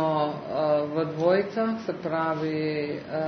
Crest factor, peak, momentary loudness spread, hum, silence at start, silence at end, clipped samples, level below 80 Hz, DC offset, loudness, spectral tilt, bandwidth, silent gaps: 16 dB; -10 dBFS; 6 LU; none; 0 s; 0 s; under 0.1%; -68 dBFS; under 0.1%; -27 LUFS; -8 dB/octave; 6.4 kHz; none